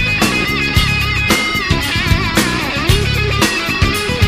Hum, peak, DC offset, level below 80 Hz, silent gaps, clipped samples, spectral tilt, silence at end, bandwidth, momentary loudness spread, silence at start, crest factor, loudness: none; 0 dBFS; under 0.1%; -24 dBFS; none; under 0.1%; -4 dB/octave; 0 s; 16 kHz; 2 LU; 0 s; 14 dB; -14 LUFS